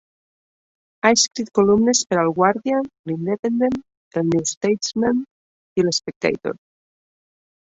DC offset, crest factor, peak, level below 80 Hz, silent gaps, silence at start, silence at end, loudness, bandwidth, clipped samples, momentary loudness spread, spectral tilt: under 0.1%; 20 dB; -2 dBFS; -58 dBFS; 2.99-3.04 s, 3.39-3.43 s, 3.97-4.11 s, 4.57-4.61 s, 5.31-5.76 s, 6.16-6.21 s; 1.05 s; 1.2 s; -20 LUFS; 8.2 kHz; under 0.1%; 12 LU; -4 dB/octave